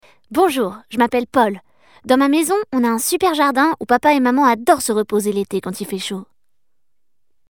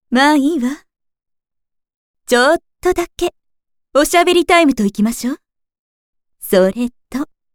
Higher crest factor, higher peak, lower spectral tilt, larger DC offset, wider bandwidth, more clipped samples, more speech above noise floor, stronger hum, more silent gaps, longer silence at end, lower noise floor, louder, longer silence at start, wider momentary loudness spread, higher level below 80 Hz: about the same, 16 dB vs 16 dB; about the same, -2 dBFS vs 0 dBFS; about the same, -4 dB/octave vs -4 dB/octave; first, 0.2% vs under 0.1%; about the same, over 20 kHz vs 19.5 kHz; neither; first, 64 dB vs 59 dB; neither; second, none vs 1.96-2.14 s, 5.79-6.13 s; first, 1.25 s vs 0.3 s; first, -80 dBFS vs -73 dBFS; about the same, -17 LUFS vs -15 LUFS; first, 0.3 s vs 0.1 s; second, 10 LU vs 14 LU; second, -58 dBFS vs -44 dBFS